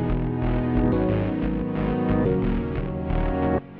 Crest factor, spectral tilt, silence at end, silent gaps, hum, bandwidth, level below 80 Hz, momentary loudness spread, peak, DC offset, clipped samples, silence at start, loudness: 14 dB; -11.5 dB/octave; 0 s; none; none; 4.7 kHz; -30 dBFS; 5 LU; -10 dBFS; under 0.1%; under 0.1%; 0 s; -24 LUFS